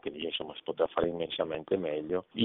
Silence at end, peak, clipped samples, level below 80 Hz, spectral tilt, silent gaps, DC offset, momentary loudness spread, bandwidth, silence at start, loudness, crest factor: 0 s; -14 dBFS; under 0.1%; -62 dBFS; -3.5 dB/octave; none; under 0.1%; 5 LU; 4.1 kHz; 0.05 s; -33 LUFS; 18 dB